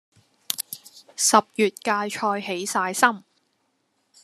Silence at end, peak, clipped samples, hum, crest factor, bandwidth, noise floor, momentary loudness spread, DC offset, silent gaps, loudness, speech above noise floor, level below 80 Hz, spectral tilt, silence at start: 1.05 s; 0 dBFS; under 0.1%; none; 24 dB; 14 kHz; -71 dBFS; 16 LU; under 0.1%; none; -23 LUFS; 49 dB; -80 dBFS; -2 dB/octave; 0.5 s